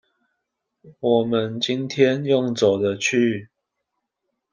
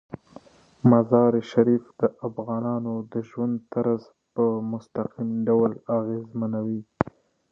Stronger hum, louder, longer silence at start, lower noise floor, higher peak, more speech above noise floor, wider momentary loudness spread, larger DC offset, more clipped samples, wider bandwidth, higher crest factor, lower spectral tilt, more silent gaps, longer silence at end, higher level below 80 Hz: neither; first, -21 LUFS vs -25 LUFS; first, 0.85 s vs 0.1 s; first, -79 dBFS vs -50 dBFS; about the same, -4 dBFS vs -2 dBFS; first, 58 dB vs 26 dB; second, 5 LU vs 11 LU; neither; neither; first, 10 kHz vs 6.4 kHz; about the same, 20 dB vs 24 dB; second, -5 dB/octave vs -10 dB/octave; neither; first, 1.05 s vs 0.4 s; second, -66 dBFS vs -60 dBFS